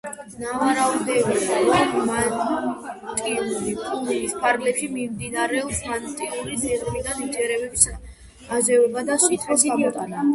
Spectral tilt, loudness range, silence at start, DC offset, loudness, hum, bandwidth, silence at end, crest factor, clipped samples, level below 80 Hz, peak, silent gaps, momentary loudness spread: -3 dB/octave; 4 LU; 0.05 s; under 0.1%; -22 LUFS; none; 12 kHz; 0 s; 22 dB; under 0.1%; -48 dBFS; 0 dBFS; none; 10 LU